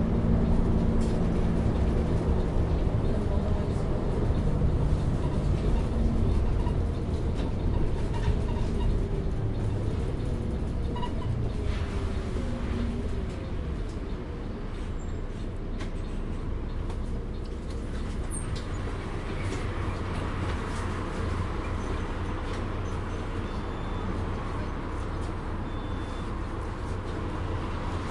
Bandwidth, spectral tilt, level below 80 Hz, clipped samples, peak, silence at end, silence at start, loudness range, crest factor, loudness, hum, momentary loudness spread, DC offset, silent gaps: 11.5 kHz; -7.5 dB/octave; -32 dBFS; under 0.1%; -12 dBFS; 0 s; 0 s; 7 LU; 16 dB; -31 LUFS; none; 8 LU; under 0.1%; none